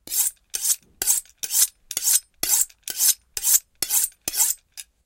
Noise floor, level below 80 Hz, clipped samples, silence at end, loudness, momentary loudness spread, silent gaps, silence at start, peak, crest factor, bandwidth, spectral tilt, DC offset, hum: -45 dBFS; -58 dBFS; under 0.1%; 0.25 s; -21 LUFS; 5 LU; none; 0.05 s; 0 dBFS; 24 dB; 17 kHz; 2.5 dB/octave; under 0.1%; none